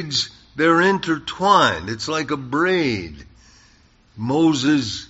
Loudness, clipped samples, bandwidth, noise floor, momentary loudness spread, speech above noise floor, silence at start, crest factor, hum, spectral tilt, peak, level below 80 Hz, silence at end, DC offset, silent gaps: -19 LUFS; under 0.1%; 8 kHz; -54 dBFS; 11 LU; 35 dB; 0 s; 18 dB; none; -3 dB/octave; -2 dBFS; -50 dBFS; 0.05 s; under 0.1%; none